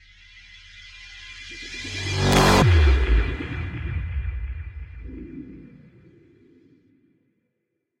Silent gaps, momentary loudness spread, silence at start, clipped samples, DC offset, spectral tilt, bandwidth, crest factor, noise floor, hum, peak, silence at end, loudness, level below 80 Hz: none; 26 LU; 0.35 s; under 0.1%; under 0.1%; -5 dB/octave; 16 kHz; 20 dB; -78 dBFS; none; -4 dBFS; 2.35 s; -22 LUFS; -28 dBFS